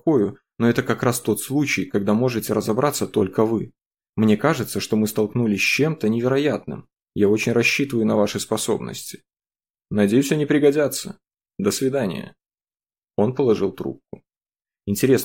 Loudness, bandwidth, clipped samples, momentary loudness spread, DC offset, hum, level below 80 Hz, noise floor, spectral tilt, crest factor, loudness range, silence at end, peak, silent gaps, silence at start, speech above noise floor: -21 LUFS; 17 kHz; under 0.1%; 13 LU; under 0.1%; none; -60 dBFS; under -90 dBFS; -5.5 dB/octave; 16 dB; 4 LU; 0 s; -4 dBFS; 3.86-3.91 s, 4.09-4.13 s; 0.05 s; over 70 dB